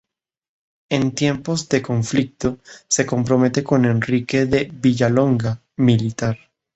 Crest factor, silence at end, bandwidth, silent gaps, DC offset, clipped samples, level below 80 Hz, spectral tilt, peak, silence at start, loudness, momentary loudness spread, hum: 16 dB; 0.4 s; 8.2 kHz; none; under 0.1%; under 0.1%; -50 dBFS; -5.5 dB/octave; -2 dBFS; 0.9 s; -19 LUFS; 8 LU; none